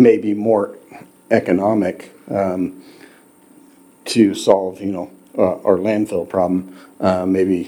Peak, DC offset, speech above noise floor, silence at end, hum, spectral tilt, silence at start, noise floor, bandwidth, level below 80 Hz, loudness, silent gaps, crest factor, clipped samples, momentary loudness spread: 0 dBFS; under 0.1%; 31 dB; 0 s; none; -6.5 dB/octave; 0 s; -48 dBFS; 19 kHz; -60 dBFS; -18 LUFS; none; 18 dB; under 0.1%; 12 LU